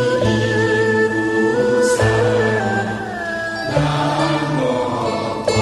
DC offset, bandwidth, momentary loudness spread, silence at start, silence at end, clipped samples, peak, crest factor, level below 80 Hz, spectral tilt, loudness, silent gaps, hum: under 0.1%; 12 kHz; 7 LU; 0 s; 0 s; under 0.1%; -2 dBFS; 14 dB; -42 dBFS; -5.5 dB/octave; -17 LUFS; none; none